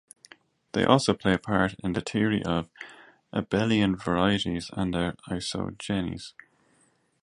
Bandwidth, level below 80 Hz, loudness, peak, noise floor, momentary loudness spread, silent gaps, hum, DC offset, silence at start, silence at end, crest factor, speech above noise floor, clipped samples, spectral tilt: 11.5 kHz; -50 dBFS; -27 LUFS; -4 dBFS; -66 dBFS; 12 LU; none; none; under 0.1%; 0.75 s; 0.95 s; 24 dB; 40 dB; under 0.1%; -5.5 dB/octave